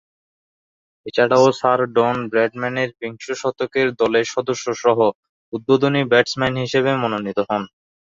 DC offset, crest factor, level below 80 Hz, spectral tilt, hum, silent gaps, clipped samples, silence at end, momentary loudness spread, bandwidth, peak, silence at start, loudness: under 0.1%; 18 dB; -58 dBFS; -5 dB/octave; none; 5.15-5.23 s, 5.29-5.52 s; under 0.1%; 0.55 s; 10 LU; 7.6 kHz; -2 dBFS; 1.05 s; -19 LUFS